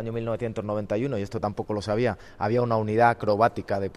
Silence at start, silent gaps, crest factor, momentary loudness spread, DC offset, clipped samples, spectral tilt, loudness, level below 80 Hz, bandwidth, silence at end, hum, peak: 0 s; none; 20 dB; 9 LU; under 0.1%; under 0.1%; -7.5 dB/octave; -26 LUFS; -52 dBFS; 11.5 kHz; 0 s; none; -6 dBFS